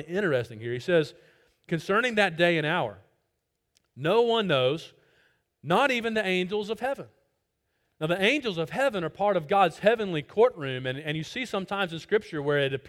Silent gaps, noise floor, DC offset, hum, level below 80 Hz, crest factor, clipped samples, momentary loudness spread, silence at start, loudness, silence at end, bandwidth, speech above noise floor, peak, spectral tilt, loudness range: none; -79 dBFS; under 0.1%; none; -66 dBFS; 18 dB; under 0.1%; 10 LU; 0 s; -26 LUFS; 0 s; 16 kHz; 53 dB; -8 dBFS; -5.5 dB/octave; 3 LU